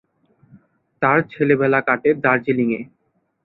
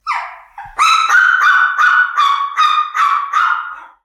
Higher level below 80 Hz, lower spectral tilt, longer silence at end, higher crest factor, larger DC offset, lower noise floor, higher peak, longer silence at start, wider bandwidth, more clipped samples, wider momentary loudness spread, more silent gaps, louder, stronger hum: about the same, -62 dBFS vs -58 dBFS; first, -10.5 dB/octave vs 3 dB/octave; first, 0.6 s vs 0.15 s; first, 18 dB vs 12 dB; neither; first, -57 dBFS vs -34 dBFS; about the same, -2 dBFS vs -2 dBFS; first, 1 s vs 0.05 s; second, 4.6 kHz vs 14 kHz; neither; second, 6 LU vs 12 LU; neither; second, -18 LUFS vs -12 LUFS; neither